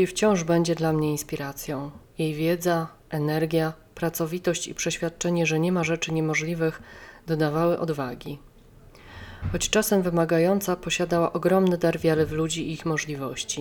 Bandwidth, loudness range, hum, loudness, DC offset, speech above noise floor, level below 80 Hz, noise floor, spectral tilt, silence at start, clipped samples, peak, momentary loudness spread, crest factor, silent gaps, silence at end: 18.5 kHz; 4 LU; none; -25 LUFS; under 0.1%; 26 dB; -48 dBFS; -51 dBFS; -5 dB/octave; 0 s; under 0.1%; -6 dBFS; 11 LU; 20 dB; none; 0 s